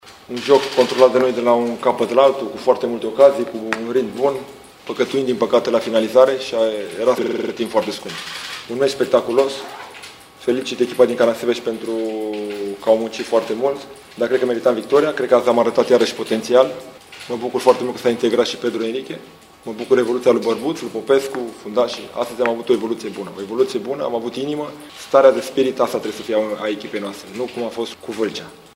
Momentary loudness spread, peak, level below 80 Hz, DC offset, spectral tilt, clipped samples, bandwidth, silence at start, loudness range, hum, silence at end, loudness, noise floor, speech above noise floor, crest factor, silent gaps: 14 LU; 0 dBFS; -62 dBFS; under 0.1%; -4.5 dB/octave; under 0.1%; 16 kHz; 0.05 s; 4 LU; none; 0.2 s; -19 LUFS; -39 dBFS; 21 dB; 18 dB; none